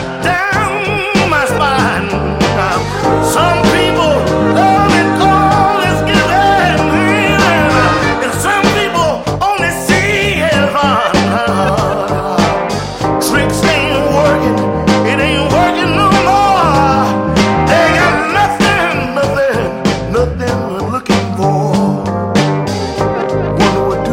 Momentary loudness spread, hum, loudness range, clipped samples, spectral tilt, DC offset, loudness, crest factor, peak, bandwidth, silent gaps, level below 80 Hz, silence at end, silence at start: 5 LU; none; 4 LU; under 0.1%; -5 dB/octave; under 0.1%; -11 LUFS; 12 dB; 0 dBFS; 16.5 kHz; none; -30 dBFS; 0 s; 0 s